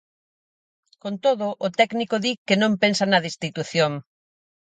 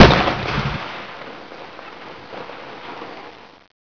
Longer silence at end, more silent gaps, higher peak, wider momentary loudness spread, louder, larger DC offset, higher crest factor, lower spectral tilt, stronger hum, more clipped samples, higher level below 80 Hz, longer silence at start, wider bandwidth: first, 0.7 s vs 0.55 s; first, 2.38-2.46 s vs none; second, -4 dBFS vs 0 dBFS; second, 10 LU vs 17 LU; about the same, -22 LUFS vs -21 LUFS; neither; about the same, 20 dB vs 20 dB; second, -4.5 dB/octave vs -6 dB/octave; neither; second, under 0.1% vs 0.2%; second, -68 dBFS vs -32 dBFS; first, 1.05 s vs 0 s; first, 9.4 kHz vs 5.4 kHz